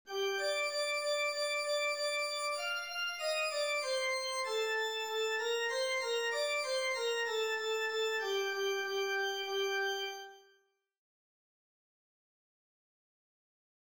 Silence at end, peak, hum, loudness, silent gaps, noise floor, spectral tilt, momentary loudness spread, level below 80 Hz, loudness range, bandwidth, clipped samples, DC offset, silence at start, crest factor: 3.55 s; -24 dBFS; none; -34 LUFS; none; -73 dBFS; 1.5 dB/octave; 2 LU; -88 dBFS; 5 LU; over 20 kHz; under 0.1%; under 0.1%; 0.05 s; 12 dB